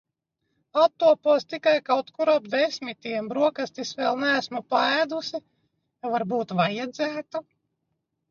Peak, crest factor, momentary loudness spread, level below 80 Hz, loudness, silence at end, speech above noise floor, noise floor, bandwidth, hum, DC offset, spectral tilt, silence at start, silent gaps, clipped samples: -8 dBFS; 18 dB; 11 LU; -76 dBFS; -24 LUFS; 0.9 s; 54 dB; -79 dBFS; 7.2 kHz; none; under 0.1%; -4.5 dB/octave; 0.75 s; none; under 0.1%